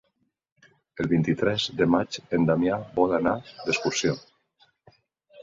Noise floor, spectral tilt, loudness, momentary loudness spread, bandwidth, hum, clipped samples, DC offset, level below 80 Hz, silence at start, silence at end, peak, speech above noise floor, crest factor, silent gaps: -75 dBFS; -5 dB/octave; -25 LUFS; 7 LU; 7.8 kHz; none; under 0.1%; under 0.1%; -56 dBFS; 0.95 s; 0 s; -6 dBFS; 51 dB; 20 dB; none